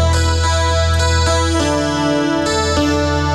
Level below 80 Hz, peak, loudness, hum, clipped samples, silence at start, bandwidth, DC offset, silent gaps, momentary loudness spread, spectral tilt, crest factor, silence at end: -22 dBFS; -4 dBFS; -15 LUFS; none; under 0.1%; 0 s; 12 kHz; under 0.1%; none; 2 LU; -5 dB/octave; 10 dB; 0 s